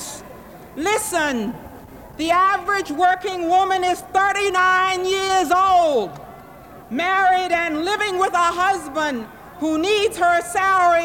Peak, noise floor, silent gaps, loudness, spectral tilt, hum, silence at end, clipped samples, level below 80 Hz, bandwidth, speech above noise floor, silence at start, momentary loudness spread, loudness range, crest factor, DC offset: -6 dBFS; -41 dBFS; none; -19 LUFS; -2.5 dB/octave; none; 0 s; under 0.1%; -50 dBFS; 17.5 kHz; 23 dB; 0 s; 13 LU; 2 LU; 14 dB; under 0.1%